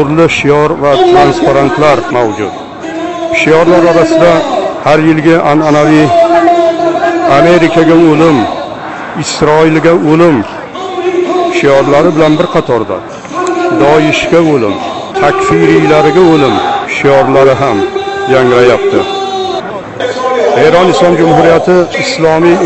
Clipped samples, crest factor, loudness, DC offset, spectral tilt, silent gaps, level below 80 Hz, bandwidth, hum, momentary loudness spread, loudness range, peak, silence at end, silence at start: 3%; 8 dB; -7 LUFS; under 0.1%; -6 dB/octave; none; -38 dBFS; 8.4 kHz; none; 11 LU; 3 LU; 0 dBFS; 0 s; 0 s